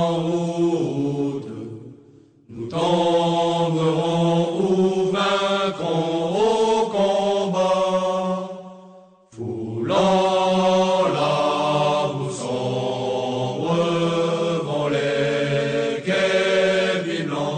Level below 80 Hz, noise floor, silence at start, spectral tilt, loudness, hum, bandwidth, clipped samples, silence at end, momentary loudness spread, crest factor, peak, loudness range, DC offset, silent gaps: -60 dBFS; -50 dBFS; 0 s; -5.5 dB/octave; -21 LUFS; none; 9.4 kHz; under 0.1%; 0 s; 8 LU; 12 dB; -8 dBFS; 3 LU; under 0.1%; none